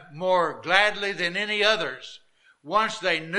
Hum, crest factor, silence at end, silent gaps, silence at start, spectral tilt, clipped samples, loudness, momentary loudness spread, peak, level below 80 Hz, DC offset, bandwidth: none; 22 dB; 0 s; none; 0 s; -3 dB/octave; under 0.1%; -23 LUFS; 9 LU; -2 dBFS; -64 dBFS; under 0.1%; 11.5 kHz